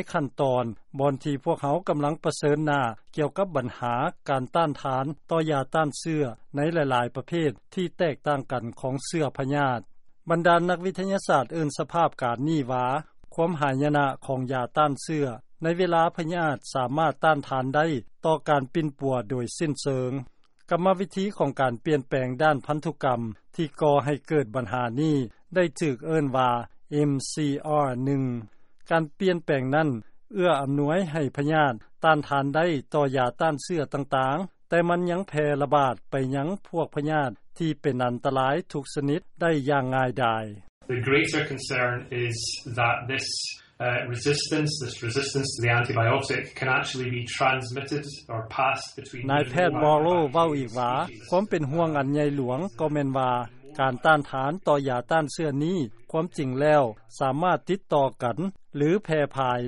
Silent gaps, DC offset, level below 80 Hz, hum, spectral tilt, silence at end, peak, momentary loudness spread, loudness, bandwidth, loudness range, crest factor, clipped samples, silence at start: 40.69-40.81 s; under 0.1%; -60 dBFS; none; -6 dB/octave; 0 s; -6 dBFS; 7 LU; -26 LUFS; 11.5 kHz; 2 LU; 18 dB; under 0.1%; 0 s